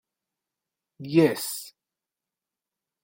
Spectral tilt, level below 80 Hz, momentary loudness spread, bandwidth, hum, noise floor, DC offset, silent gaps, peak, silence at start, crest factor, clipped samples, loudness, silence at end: -5.5 dB/octave; -76 dBFS; 22 LU; 17 kHz; none; -89 dBFS; under 0.1%; none; -8 dBFS; 1 s; 22 dB; under 0.1%; -24 LUFS; 1.35 s